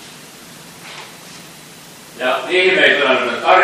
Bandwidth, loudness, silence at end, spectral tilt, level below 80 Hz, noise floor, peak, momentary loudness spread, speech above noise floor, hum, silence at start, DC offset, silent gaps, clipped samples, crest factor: 15.5 kHz; -13 LUFS; 0 s; -2.5 dB/octave; -64 dBFS; -38 dBFS; 0 dBFS; 25 LU; 25 dB; none; 0 s; under 0.1%; none; under 0.1%; 18 dB